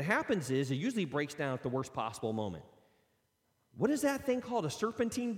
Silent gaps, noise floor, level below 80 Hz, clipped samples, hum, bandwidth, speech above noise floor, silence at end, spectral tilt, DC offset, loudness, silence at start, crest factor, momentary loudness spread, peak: none; -77 dBFS; -70 dBFS; under 0.1%; none; 16.5 kHz; 43 dB; 0 s; -5.5 dB/octave; under 0.1%; -35 LUFS; 0 s; 18 dB; 6 LU; -16 dBFS